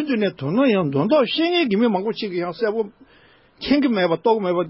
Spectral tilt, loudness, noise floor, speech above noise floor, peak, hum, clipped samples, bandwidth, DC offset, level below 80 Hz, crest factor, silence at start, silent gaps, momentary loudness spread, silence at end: -10.5 dB/octave; -20 LUFS; -53 dBFS; 34 dB; -6 dBFS; none; under 0.1%; 5.8 kHz; under 0.1%; -58 dBFS; 16 dB; 0 s; none; 7 LU; 0 s